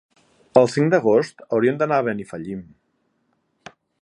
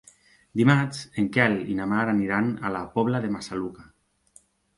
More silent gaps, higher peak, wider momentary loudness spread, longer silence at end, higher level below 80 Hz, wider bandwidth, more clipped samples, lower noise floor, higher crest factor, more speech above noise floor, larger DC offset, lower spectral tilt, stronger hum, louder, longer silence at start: neither; first, 0 dBFS vs -6 dBFS; first, 15 LU vs 11 LU; first, 1.4 s vs 0.95 s; second, -64 dBFS vs -58 dBFS; about the same, 11 kHz vs 11.5 kHz; neither; first, -69 dBFS vs -59 dBFS; about the same, 22 dB vs 20 dB; first, 49 dB vs 34 dB; neither; about the same, -7 dB/octave vs -6.5 dB/octave; neither; first, -20 LUFS vs -25 LUFS; about the same, 0.55 s vs 0.55 s